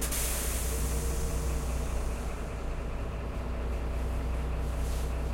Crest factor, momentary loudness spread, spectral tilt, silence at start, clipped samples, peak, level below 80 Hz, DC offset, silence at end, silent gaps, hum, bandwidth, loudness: 14 dB; 6 LU; -4.5 dB/octave; 0 s; under 0.1%; -18 dBFS; -32 dBFS; under 0.1%; 0 s; none; none; 16.5 kHz; -34 LUFS